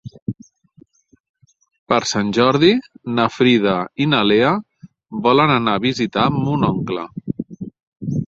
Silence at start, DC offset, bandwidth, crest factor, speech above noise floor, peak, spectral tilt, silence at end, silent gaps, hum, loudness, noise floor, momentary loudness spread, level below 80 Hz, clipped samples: 0.05 s; under 0.1%; 7.8 kHz; 18 dB; 36 dB; -2 dBFS; -5.5 dB/octave; 0 s; 0.22-0.26 s, 1.20-1.34 s, 1.79-1.86 s, 7.83-7.92 s; none; -17 LUFS; -52 dBFS; 16 LU; -52 dBFS; under 0.1%